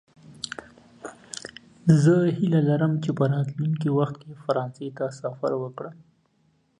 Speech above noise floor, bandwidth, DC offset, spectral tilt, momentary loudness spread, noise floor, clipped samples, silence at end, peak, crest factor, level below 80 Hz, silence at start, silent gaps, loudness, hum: 43 dB; 10 kHz; under 0.1%; -7.5 dB/octave; 20 LU; -66 dBFS; under 0.1%; 0.85 s; -4 dBFS; 22 dB; -64 dBFS; 0.3 s; none; -24 LUFS; none